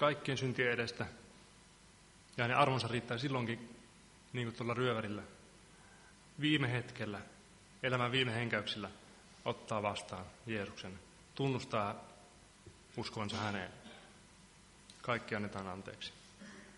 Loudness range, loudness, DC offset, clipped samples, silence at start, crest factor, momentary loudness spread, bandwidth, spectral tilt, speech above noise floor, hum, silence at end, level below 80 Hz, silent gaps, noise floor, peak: 6 LU; -38 LUFS; under 0.1%; under 0.1%; 0 s; 26 dB; 25 LU; 11.5 kHz; -5.5 dB/octave; 24 dB; none; 0 s; -68 dBFS; none; -62 dBFS; -14 dBFS